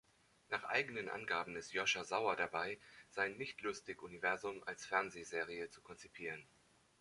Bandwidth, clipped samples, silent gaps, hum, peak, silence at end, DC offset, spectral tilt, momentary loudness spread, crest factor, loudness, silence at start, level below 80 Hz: 11.5 kHz; under 0.1%; none; none; -20 dBFS; 0.6 s; under 0.1%; -2.5 dB/octave; 12 LU; 22 dB; -41 LUFS; 0.5 s; -78 dBFS